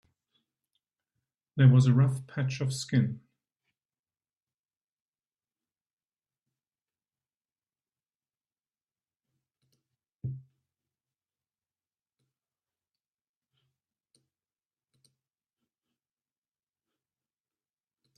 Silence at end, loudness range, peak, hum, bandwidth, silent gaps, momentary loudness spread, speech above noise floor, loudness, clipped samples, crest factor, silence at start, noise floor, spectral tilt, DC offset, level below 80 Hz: 7.8 s; 22 LU; -10 dBFS; none; 11.5 kHz; 3.85-3.89 s, 4.54-4.64 s, 4.84-5.13 s, 5.93-5.97 s, 7.52-7.56 s, 8.15-8.20 s, 10.15-10.19 s; 20 LU; over 66 dB; -26 LUFS; under 0.1%; 24 dB; 1.55 s; under -90 dBFS; -7 dB/octave; under 0.1%; -70 dBFS